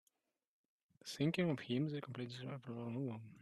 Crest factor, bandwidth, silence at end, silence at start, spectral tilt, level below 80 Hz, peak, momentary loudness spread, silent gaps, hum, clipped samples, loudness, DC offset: 20 dB; 13 kHz; 0 s; 1.05 s; -6.5 dB/octave; -80 dBFS; -24 dBFS; 11 LU; none; none; under 0.1%; -42 LUFS; under 0.1%